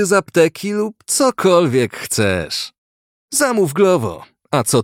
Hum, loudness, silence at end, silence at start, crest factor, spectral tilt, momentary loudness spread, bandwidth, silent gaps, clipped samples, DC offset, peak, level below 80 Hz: none; -16 LUFS; 0 s; 0 s; 16 dB; -4 dB/octave; 9 LU; 17 kHz; 2.78-3.28 s; under 0.1%; under 0.1%; -2 dBFS; -52 dBFS